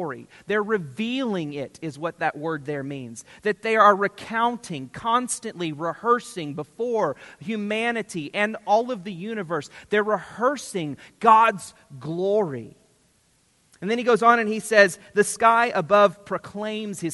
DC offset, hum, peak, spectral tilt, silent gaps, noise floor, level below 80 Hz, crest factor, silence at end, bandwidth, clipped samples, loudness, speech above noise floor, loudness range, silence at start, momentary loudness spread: under 0.1%; none; -2 dBFS; -4.5 dB/octave; none; -63 dBFS; -68 dBFS; 22 dB; 0 s; 11.5 kHz; under 0.1%; -23 LUFS; 40 dB; 6 LU; 0 s; 15 LU